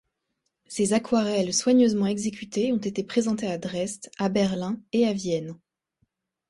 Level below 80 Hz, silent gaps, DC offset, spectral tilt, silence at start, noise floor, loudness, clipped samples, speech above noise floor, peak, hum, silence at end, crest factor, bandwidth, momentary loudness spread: -62 dBFS; none; under 0.1%; -5 dB/octave; 0.7 s; -79 dBFS; -25 LUFS; under 0.1%; 54 dB; -10 dBFS; none; 0.95 s; 16 dB; 11.5 kHz; 10 LU